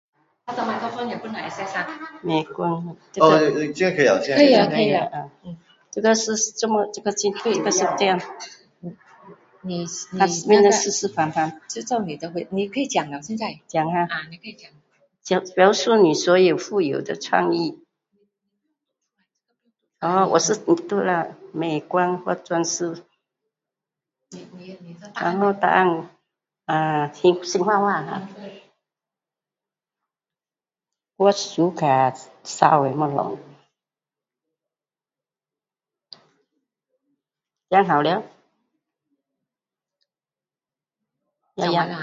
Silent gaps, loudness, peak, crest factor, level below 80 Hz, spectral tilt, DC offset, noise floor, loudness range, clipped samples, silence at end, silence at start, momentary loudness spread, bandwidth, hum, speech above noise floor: none; -21 LUFS; 0 dBFS; 22 dB; -68 dBFS; -4 dB/octave; under 0.1%; under -90 dBFS; 8 LU; under 0.1%; 0 s; 0.45 s; 21 LU; 8 kHz; none; over 69 dB